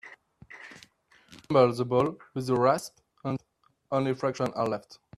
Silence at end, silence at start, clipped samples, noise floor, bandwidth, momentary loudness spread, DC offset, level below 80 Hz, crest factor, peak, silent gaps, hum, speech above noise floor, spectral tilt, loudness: 0.25 s; 0.05 s; under 0.1%; -69 dBFS; 13.5 kHz; 21 LU; under 0.1%; -66 dBFS; 22 dB; -8 dBFS; none; none; 42 dB; -6.5 dB/octave; -28 LUFS